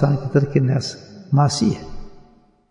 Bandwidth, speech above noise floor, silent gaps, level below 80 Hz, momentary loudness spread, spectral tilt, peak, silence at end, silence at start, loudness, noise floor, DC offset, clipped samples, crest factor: 10.5 kHz; 33 dB; none; -42 dBFS; 14 LU; -6.5 dB/octave; -2 dBFS; 0.5 s; 0 s; -20 LUFS; -51 dBFS; under 0.1%; under 0.1%; 18 dB